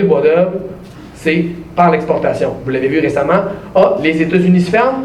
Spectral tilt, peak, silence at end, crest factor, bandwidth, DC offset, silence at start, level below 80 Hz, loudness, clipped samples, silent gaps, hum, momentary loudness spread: -7.5 dB/octave; 0 dBFS; 0 s; 14 dB; 11 kHz; under 0.1%; 0 s; -44 dBFS; -13 LUFS; under 0.1%; none; none; 8 LU